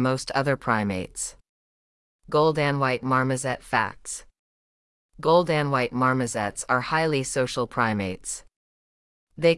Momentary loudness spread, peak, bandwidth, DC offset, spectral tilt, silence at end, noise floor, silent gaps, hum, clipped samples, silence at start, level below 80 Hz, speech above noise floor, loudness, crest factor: 11 LU; -8 dBFS; 12 kHz; under 0.1%; -5 dB/octave; 0 s; under -90 dBFS; 1.49-2.19 s, 4.39-5.09 s, 8.56-9.27 s; none; under 0.1%; 0 s; -54 dBFS; over 66 dB; -24 LUFS; 18 dB